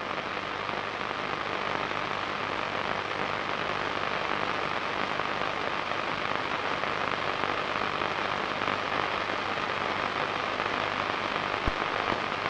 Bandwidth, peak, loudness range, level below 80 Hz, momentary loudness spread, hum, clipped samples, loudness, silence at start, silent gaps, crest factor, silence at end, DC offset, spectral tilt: 11 kHz; -6 dBFS; 1 LU; -52 dBFS; 2 LU; 50 Hz at -50 dBFS; under 0.1%; -30 LUFS; 0 s; none; 24 dB; 0 s; under 0.1%; -4 dB/octave